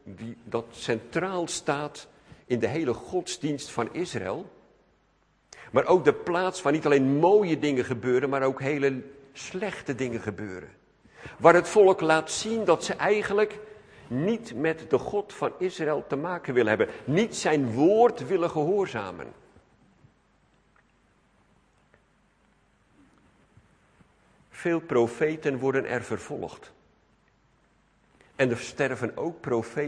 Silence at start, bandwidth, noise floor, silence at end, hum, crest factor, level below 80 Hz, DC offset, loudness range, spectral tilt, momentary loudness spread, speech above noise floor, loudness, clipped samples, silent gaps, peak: 0.05 s; 10.5 kHz; -66 dBFS; 0 s; none; 26 dB; -64 dBFS; under 0.1%; 9 LU; -5.5 dB/octave; 15 LU; 41 dB; -26 LUFS; under 0.1%; none; -2 dBFS